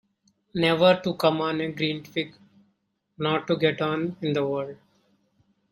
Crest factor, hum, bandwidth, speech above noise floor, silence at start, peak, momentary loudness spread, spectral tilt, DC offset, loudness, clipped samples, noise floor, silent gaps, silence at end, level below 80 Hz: 22 dB; none; 16 kHz; 48 dB; 0.55 s; -6 dBFS; 12 LU; -6.5 dB/octave; under 0.1%; -25 LUFS; under 0.1%; -73 dBFS; none; 0.95 s; -66 dBFS